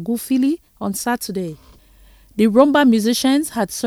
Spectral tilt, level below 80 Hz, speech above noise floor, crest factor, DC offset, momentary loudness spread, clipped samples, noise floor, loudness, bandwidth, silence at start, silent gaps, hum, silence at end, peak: -4.5 dB/octave; -52 dBFS; 31 dB; 18 dB; under 0.1%; 13 LU; under 0.1%; -48 dBFS; -17 LUFS; 17 kHz; 0 s; none; none; 0 s; 0 dBFS